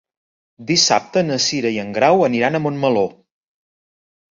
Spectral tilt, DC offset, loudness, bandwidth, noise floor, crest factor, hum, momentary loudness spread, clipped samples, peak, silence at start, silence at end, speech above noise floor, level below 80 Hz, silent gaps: -3.5 dB/octave; under 0.1%; -17 LUFS; 7.8 kHz; under -90 dBFS; 18 dB; none; 7 LU; under 0.1%; -2 dBFS; 0.6 s; 1.2 s; over 73 dB; -60 dBFS; none